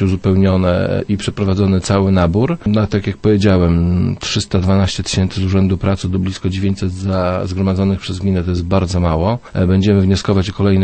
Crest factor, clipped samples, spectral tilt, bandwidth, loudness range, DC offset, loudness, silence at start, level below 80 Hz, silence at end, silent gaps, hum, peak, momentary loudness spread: 14 dB; under 0.1%; -7 dB/octave; 8.8 kHz; 3 LU; under 0.1%; -15 LUFS; 0 s; -32 dBFS; 0 s; none; none; -2 dBFS; 5 LU